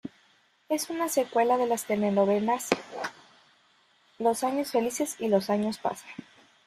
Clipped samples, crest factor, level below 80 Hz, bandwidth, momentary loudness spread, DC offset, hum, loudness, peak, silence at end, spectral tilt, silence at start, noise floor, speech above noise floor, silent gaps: under 0.1%; 24 dB; -72 dBFS; 15.5 kHz; 13 LU; under 0.1%; none; -28 LUFS; -4 dBFS; 0.45 s; -4.5 dB/octave; 0.05 s; -65 dBFS; 38 dB; none